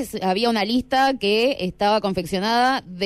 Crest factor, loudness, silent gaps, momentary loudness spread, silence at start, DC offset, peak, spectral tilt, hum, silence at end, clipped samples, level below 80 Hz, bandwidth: 12 dB; -20 LUFS; none; 4 LU; 0 s; under 0.1%; -10 dBFS; -4.5 dB/octave; none; 0 s; under 0.1%; -50 dBFS; 15.5 kHz